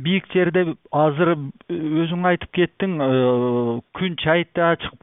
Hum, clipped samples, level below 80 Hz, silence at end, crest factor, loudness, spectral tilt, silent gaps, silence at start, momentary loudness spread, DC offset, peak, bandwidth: none; under 0.1%; -54 dBFS; 0.05 s; 16 dB; -21 LUFS; -11.5 dB/octave; none; 0 s; 7 LU; under 0.1%; -4 dBFS; 3.9 kHz